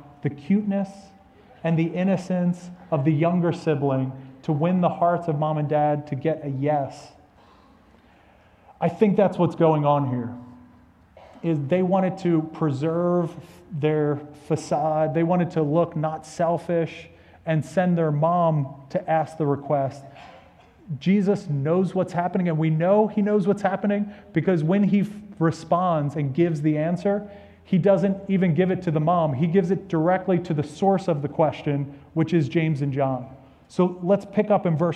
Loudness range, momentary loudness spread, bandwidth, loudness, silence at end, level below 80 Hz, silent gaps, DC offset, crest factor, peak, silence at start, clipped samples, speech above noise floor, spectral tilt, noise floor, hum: 3 LU; 9 LU; 9.8 kHz; -23 LUFS; 0 s; -60 dBFS; none; under 0.1%; 18 dB; -6 dBFS; 0.05 s; under 0.1%; 32 dB; -8.5 dB/octave; -55 dBFS; none